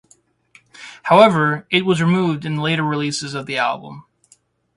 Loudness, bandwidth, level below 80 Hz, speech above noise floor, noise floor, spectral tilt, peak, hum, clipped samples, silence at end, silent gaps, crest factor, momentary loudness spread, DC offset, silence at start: -17 LUFS; 11.5 kHz; -60 dBFS; 40 dB; -57 dBFS; -5.5 dB/octave; 0 dBFS; none; under 0.1%; 0.75 s; none; 20 dB; 18 LU; under 0.1%; 0.8 s